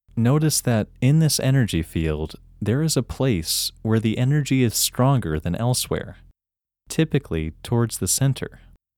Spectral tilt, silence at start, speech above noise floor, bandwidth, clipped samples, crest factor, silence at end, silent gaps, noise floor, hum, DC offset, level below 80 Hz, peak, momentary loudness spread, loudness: -5 dB/octave; 0.15 s; 68 dB; 19 kHz; under 0.1%; 16 dB; 0.4 s; none; -89 dBFS; none; under 0.1%; -42 dBFS; -6 dBFS; 10 LU; -22 LUFS